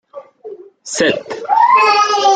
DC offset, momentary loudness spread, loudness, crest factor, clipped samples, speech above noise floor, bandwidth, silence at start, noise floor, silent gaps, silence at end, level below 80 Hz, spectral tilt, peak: under 0.1%; 25 LU; -13 LUFS; 14 dB; under 0.1%; 21 dB; 9.6 kHz; 0.15 s; -34 dBFS; none; 0 s; -64 dBFS; -2 dB/octave; 0 dBFS